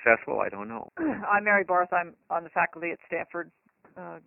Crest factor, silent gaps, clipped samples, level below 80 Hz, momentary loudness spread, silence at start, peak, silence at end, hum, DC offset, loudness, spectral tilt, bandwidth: 22 dB; none; under 0.1%; -68 dBFS; 16 LU; 0 s; -6 dBFS; 0.1 s; none; under 0.1%; -27 LUFS; -5 dB/octave; 3 kHz